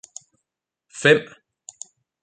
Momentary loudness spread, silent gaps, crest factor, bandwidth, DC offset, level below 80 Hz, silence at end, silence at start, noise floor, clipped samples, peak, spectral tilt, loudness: 25 LU; none; 24 dB; 9.4 kHz; under 0.1%; -70 dBFS; 1 s; 0.95 s; -82 dBFS; under 0.1%; -2 dBFS; -4 dB/octave; -18 LUFS